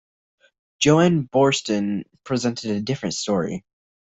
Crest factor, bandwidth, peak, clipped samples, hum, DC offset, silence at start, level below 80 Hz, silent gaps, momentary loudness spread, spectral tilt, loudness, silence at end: 18 dB; 8.4 kHz; -4 dBFS; under 0.1%; none; under 0.1%; 0.8 s; -58 dBFS; none; 11 LU; -5 dB/octave; -21 LUFS; 0.45 s